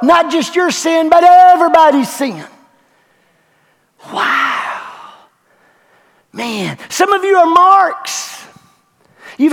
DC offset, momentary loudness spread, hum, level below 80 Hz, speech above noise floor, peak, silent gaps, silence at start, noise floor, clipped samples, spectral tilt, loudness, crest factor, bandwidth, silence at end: under 0.1%; 19 LU; none; -58 dBFS; 46 dB; 0 dBFS; none; 0 s; -56 dBFS; 0.3%; -3.5 dB/octave; -11 LUFS; 12 dB; 16.5 kHz; 0 s